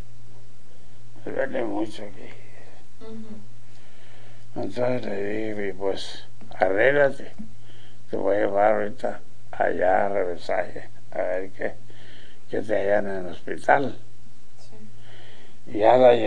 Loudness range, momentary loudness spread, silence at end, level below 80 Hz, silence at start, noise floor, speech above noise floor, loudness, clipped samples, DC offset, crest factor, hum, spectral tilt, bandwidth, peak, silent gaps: 10 LU; 22 LU; 0 s; -58 dBFS; 0.85 s; -51 dBFS; 27 dB; -24 LUFS; under 0.1%; 6%; 22 dB; none; -6 dB/octave; 10 kHz; -2 dBFS; none